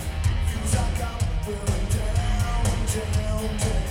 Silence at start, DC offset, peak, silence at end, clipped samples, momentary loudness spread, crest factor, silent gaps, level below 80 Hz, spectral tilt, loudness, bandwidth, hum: 0 s; under 0.1%; -8 dBFS; 0 s; under 0.1%; 3 LU; 14 dB; none; -26 dBFS; -5 dB/octave; -26 LUFS; 16 kHz; none